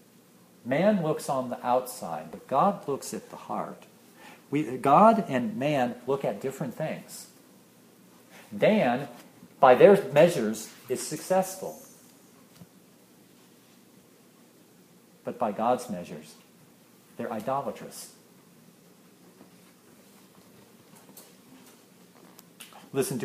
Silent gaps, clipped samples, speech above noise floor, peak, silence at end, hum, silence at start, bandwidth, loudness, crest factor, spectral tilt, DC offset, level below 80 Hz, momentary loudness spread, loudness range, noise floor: none; under 0.1%; 31 dB; -4 dBFS; 0 s; none; 0.65 s; 15.5 kHz; -26 LUFS; 26 dB; -5.5 dB/octave; under 0.1%; -74 dBFS; 23 LU; 15 LU; -57 dBFS